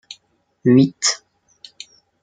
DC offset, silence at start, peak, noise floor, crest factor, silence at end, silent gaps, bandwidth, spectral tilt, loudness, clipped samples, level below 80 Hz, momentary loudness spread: under 0.1%; 0.65 s; -2 dBFS; -60 dBFS; 18 dB; 1.05 s; none; 9.6 kHz; -4.5 dB/octave; -17 LUFS; under 0.1%; -66 dBFS; 25 LU